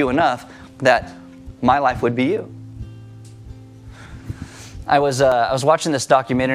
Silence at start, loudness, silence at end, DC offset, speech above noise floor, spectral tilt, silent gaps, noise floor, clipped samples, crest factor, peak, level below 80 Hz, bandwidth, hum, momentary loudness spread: 0 s; -18 LUFS; 0 s; under 0.1%; 22 dB; -5 dB/octave; none; -39 dBFS; under 0.1%; 18 dB; -2 dBFS; -44 dBFS; 14.5 kHz; none; 23 LU